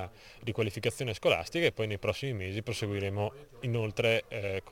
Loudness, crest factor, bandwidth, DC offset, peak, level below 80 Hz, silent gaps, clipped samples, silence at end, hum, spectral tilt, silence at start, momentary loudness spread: -32 LUFS; 20 dB; 16.5 kHz; under 0.1%; -12 dBFS; -58 dBFS; none; under 0.1%; 0 s; none; -5 dB/octave; 0 s; 8 LU